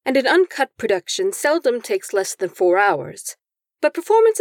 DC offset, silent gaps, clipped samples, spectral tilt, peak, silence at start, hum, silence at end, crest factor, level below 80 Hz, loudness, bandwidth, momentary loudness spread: under 0.1%; none; under 0.1%; -3 dB/octave; -4 dBFS; 0.05 s; none; 0 s; 14 dB; -72 dBFS; -19 LUFS; 18.5 kHz; 9 LU